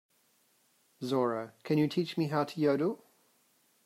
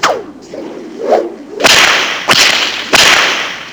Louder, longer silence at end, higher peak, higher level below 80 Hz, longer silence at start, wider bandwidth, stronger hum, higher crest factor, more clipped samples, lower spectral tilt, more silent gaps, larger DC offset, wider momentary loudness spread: second, -32 LUFS vs -8 LUFS; first, 0.9 s vs 0 s; second, -16 dBFS vs 0 dBFS; second, -78 dBFS vs -46 dBFS; first, 1 s vs 0 s; second, 15.5 kHz vs over 20 kHz; neither; about the same, 16 dB vs 12 dB; second, under 0.1% vs 1%; first, -7 dB/octave vs -0.5 dB/octave; neither; neither; second, 9 LU vs 20 LU